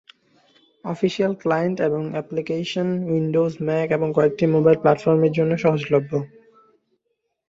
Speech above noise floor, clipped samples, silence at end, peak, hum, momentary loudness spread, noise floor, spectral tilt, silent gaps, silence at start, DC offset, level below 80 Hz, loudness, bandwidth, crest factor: 55 dB; under 0.1%; 1.2 s; -2 dBFS; none; 9 LU; -75 dBFS; -7.5 dB/octave; none; 0.85 s; under 0.1%; -62 dBFS; -21 LUFS; 7.6 kHz; 18 dB